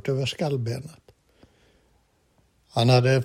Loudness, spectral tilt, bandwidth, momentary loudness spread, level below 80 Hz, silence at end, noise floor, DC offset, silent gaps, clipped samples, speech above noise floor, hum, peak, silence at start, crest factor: -24 LUFS; -6 dB/octave; 13 kHz; 15 LU; -60 dBFS; 0 s; -65 dBFS; under 0.1%; none; under 0.1%; 42 dB; none; -6 dBFS; 0.05 s; 20 dB